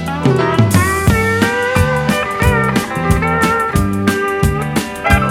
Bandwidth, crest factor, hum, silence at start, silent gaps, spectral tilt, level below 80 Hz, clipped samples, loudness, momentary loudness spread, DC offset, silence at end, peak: 17.5 kHz; 14 dB; none; 0 s; none; -5.5 dB/octave; -26 dBFS; under 0.1%; -14 LUFS; 4 LU; under 0.1%; 0 s; 0 dBFS